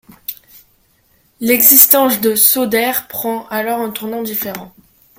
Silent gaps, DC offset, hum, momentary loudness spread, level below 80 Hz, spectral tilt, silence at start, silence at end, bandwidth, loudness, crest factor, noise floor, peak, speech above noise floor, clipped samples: none; under 0.1%; none; 20 LU; -58 dBFS; -2 dB/octave; 0.3 s; 0.5 s; over 20 kHz; -11 LUFS; 16 dB; -56 dBFS; 0 dBFS; 42 dB; 0.4%